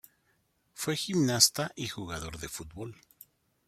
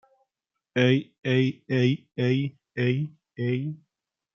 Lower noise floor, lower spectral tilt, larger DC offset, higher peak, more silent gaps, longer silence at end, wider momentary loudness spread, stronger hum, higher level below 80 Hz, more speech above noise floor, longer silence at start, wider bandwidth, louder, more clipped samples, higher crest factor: second, -73 dBFS vs -85 dBFS; second, -3 dB/octave vs -7.5 dB/octave; neither; about the same, -6 dBFS vs -8 dBFS; second, none vs 1.18-1.22 s; first, 0.75 s vs 0.6 s; first, 19 LU vs 10 LU; neither; first, -58 dBFS vs -70 dBFS; second, 42 dB vs 61 dB; about the same, 0.75 s vs 0.75 s; first, 16.5 kHz vs 6.8 kHz; second, -29 LUFS vs -26 LUFS; neither; first, 28 dB vs 18 dB